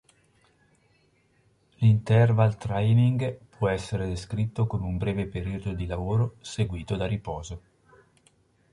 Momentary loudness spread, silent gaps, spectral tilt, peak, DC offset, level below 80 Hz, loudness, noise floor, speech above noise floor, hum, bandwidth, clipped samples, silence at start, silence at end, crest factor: 11 LU; none; -7.5 dB/octave; -8 dBFS; under 0.1%; -44 dBFS; -26 LUFS; -65 dBFS; 40 dB; none; 11 kHz; under 0.1%; 1.8 s; 1.15 s; 18 dB